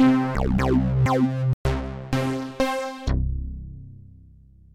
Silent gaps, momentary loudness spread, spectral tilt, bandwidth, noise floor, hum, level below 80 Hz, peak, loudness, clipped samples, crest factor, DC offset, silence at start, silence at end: 1.53-1.65 s; 16 LU; -7.5 dB/octave; 13.5 kHz; -50 dBFS; none; -32 dBFS; -10 dBFS; -24 LUFS; under 0.1%; 14 dB; under 0.1%; 0 s; 0.75 s